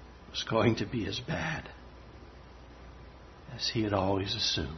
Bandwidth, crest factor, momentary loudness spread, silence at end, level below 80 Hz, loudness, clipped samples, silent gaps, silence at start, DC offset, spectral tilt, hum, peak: 6.4 kHz; 22 dB; 23 LU; 0 s; -52 dBFS; -31 LUFS; under 0.1%; none; 0 s; under 0.1%; -5 dB/octave; none; -10 dBFS